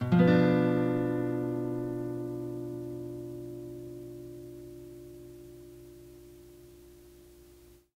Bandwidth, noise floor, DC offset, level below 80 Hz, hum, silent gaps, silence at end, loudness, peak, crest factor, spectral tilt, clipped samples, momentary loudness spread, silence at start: 15.5 kHz; -57 dBFS; under 0.1%; -60 dBFS; none; none; 0.55 s; -30 LUFS; -12 dBFS; 20 dB; -8.5 dB/octave; under 0.1%; 26 LU; 0 s